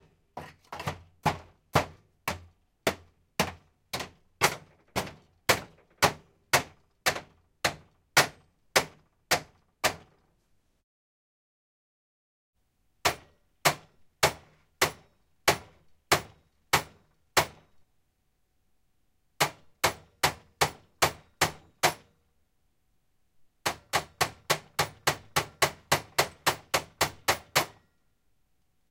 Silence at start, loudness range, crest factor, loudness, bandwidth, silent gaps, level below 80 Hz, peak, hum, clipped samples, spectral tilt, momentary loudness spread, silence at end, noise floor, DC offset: 0.35 s; 6 LU; 28 dB; -29 LUFS; 16.5 kHz; 10.83-12.53 s; -60 dBFS; -4 dBFS; none; under 0.1%; -2 dB/octave; 15 LU; 1.2 s; -74 dBFS; under 0.1%